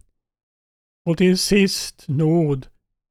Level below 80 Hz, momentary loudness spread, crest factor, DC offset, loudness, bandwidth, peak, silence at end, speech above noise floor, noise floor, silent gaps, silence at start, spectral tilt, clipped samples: -46 dBFS; 10 LU; 16 dB; under 0.1%; -19 LUFS; 15.5 kHz; -6 dBFS; 0.45 s; over 72 dB; under -90 dBFS; none; 1.05 s; -5.5 dB/octave; under 0.1%